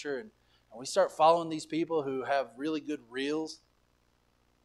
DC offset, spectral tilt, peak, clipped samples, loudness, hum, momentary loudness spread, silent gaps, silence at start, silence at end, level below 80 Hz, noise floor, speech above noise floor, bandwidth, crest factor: under 0.1%; -4.5 dB/octave; -12 dBFS; under 0.1%; -31 LUFS; 60 Hz at -70 dBFS; 15 LU; none; 0 s; 1.1 s; -74 dBFS; -70 dBFS; 40 dB; 13 kHz; 20 dB